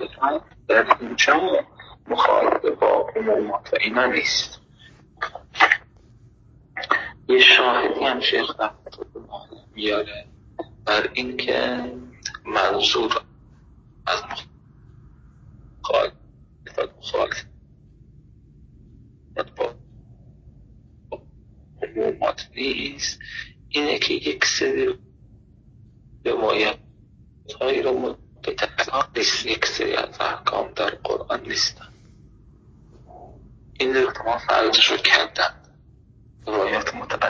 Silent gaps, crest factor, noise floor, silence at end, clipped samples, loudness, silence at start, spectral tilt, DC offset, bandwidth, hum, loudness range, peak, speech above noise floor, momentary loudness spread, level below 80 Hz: none; 24 dB; -52 dBFS; 0 s; under 0.1%; -21 LUFS; 0 s; -2 dB/octave; under 0.1%; 7.6 kHz; none; 12 LU; 0 dBFS; 30 dB; 18 LU; -52 dBFS